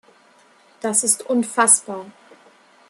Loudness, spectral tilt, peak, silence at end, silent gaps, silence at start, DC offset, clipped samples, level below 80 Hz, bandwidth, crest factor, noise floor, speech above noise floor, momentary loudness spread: -17 LUFS; -1.5 dB/octave; -2 dBFS; 0.8 s; none; 0.85 s; under 0.1%; under 0.1%; -76 dBFS; 13 kHz; 20 dB; -54 dBFS; 34 dB; 17 LU